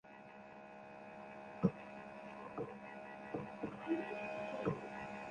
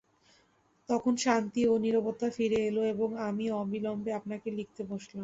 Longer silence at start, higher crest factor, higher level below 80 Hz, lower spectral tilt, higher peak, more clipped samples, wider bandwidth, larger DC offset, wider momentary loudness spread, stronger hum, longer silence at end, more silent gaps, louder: second, 0.05 s vs 0.9 s; first, 26 dB vs 20 dB; second, -72 dBFS vs -66 dBFS; first, -8 dB/octave vs -5.5 dB/octave; second, -20 dBFS vs -12 dBFS; neither; first, 9.6 kHz vs 8 kHz; neither; first, 16 LU vs 10 LU; neither; about the same, 0 s vs 0 s; neither; second, -45 LUFS vs -31 LUFS